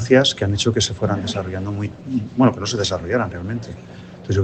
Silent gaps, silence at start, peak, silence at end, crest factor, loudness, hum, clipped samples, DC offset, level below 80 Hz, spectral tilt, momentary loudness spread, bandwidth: none; 0 s; 0 dBFS; 0 s; 20 dB; -21 LUFS; none; under 0.1%; under 0.1%; -46 dBFS; -5 dB/octave; 12 LU; 9 kHz